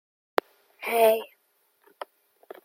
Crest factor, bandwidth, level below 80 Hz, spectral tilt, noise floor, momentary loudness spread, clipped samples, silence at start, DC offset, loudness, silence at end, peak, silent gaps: 26 dB; 16.5 kHz; -88 dBFS; -2 dB/octave; -69 dBFS; 23 LU; under 0.1%; 0.8 s; under 0.1%; -25 LUFS; 1.4 s; -2 dBFS; none